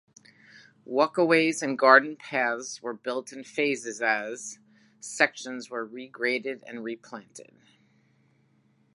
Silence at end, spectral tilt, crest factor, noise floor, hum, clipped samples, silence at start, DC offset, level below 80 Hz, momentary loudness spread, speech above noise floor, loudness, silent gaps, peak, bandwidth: 1.55 s; -3.5 dB/octave; 26 dB; -66 dBFS; none; under 0.1%; 0.55 s; under 0.1%; -86 dBFS; 19 LU; 39 dB; -26 LUFS; none; -2 dBFS; 11.5 kHz